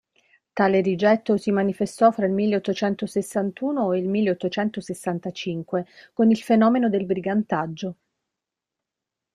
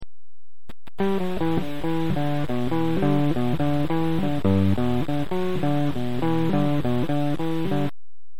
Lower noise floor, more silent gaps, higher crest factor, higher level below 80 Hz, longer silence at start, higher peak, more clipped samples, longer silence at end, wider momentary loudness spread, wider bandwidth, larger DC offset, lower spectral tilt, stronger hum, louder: second, -86 dBFS vs under -90 dBFS; neither; about the same, 20 dB vs 16 dB; second, -66 dBFS vs -46 dBFS; first, 0.55 s vs 0 s; first, -4 dBFS vs -8 dBFS; neither; first, 1.4 s vs 0.5 s; first, 10 LU vs 5 LU; second, 13 kHz vs 18.5 kHz; second, under 0.1% vs 6%; second, -6.5 dB/octave vs -8 dB/octave; neither; about the same, -23 LUFS vs -24 LUFS